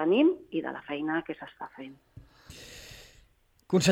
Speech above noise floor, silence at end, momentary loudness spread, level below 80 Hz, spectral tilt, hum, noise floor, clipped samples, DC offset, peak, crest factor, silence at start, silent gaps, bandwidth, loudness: 35 dB; 0 s; 23 LU; -62 dBFS; -5 dB/octave; none; -64 dBFS; under 0.1%; under 0.1%; -10 dBFS; 20 dB; 0 s; none; 16.5 kHz; -29 LUFS